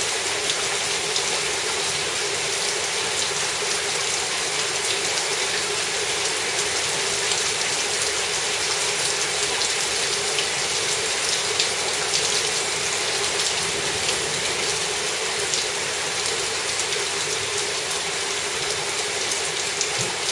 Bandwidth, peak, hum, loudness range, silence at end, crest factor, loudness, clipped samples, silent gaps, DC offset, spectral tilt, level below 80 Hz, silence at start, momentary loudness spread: 11.5 kHz; 0 dBFS; none; 2 LU; 0 s; 24 dB; -21 LUFS; under 0.1%; none; under 0.1%; 0 dB/octave; -58 dBFS; 0 s; 2 LU